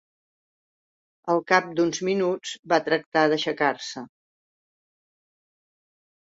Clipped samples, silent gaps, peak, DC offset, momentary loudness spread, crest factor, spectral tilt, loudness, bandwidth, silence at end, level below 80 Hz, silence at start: under 0.1%; 2.59-2.63 s, 3.06-3.12 s; -4 dBFS; under 0.1%; 12 LU; 24 dB; -4 dB/octave; -24 LUFS; 8 kHz; 2.15 s; -72 dBFS; 1.25 s